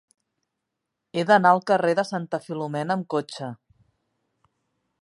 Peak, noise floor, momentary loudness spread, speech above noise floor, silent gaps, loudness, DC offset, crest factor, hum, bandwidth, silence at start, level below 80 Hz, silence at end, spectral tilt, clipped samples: -4 dBFS; -82 dBFS; 16 LU; 59 dB; none; -23 LUFS; under 0.1%; 22 dB; none; 11.5 kHz; 1.15 s; -76 dBFS; 1.5 s; -6 dB/octave; under 0.1%